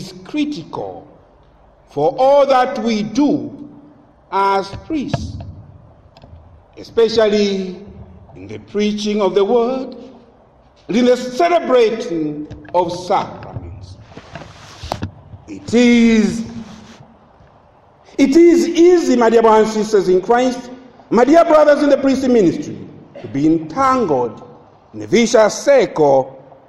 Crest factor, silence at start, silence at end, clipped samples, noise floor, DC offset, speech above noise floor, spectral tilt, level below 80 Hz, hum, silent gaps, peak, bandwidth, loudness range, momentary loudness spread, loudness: 16 dB; 0 s; 0.3 s; under 0.1%; -49 dBFS; under 0.1%; 35 dB; -5.5 dB/octave; -46 dBFS; none; none; 0 dBFS; 12 kHz; 8 LU; 21 LU; -14 LUFS